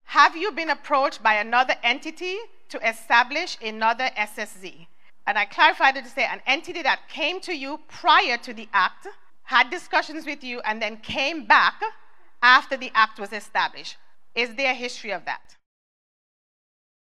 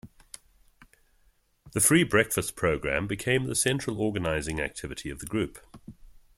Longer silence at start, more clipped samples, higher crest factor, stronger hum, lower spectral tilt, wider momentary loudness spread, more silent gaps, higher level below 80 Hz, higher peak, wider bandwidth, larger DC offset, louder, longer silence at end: about the same, 0 s vs 0.05 s; neither; about the same, 22 dB vs 22 dB; neither; second, -1.5 dB/octave vs -4 dB/octave; second, 14 LU vs 20 LU; neither; second, -68 dBFS vs -50 dBFS; first, -2 dBFS vs -8 dBFS; second, 14 kHz vs 16.5 kHz; first, 0.8% vs under 0.1%; first, -22 LUFS vs -27 LUFS; first, 1.35 s vs 0.25 s